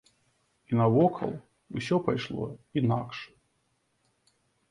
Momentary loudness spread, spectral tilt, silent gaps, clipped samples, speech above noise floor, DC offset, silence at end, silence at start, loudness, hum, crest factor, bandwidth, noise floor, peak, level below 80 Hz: 17 LU; -8 dB/octave; none; under 0.1%; 46 dB; under 0.1%; 1.45 s; 0.7 s; -29 LUFS; none; 20 dB; 11 kHz; -74 dBFS; -12 dBFS; -62 dBFS